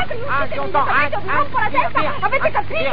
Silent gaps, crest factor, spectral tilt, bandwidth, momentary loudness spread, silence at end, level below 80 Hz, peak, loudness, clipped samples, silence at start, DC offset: none; 14 dB; -7.5 dB/octave; 5.2 kHz; 4 LU; 0 s; -40 dBFS; -4 dBFS; -19 LUFS; under 0.1%; 0 s; 10%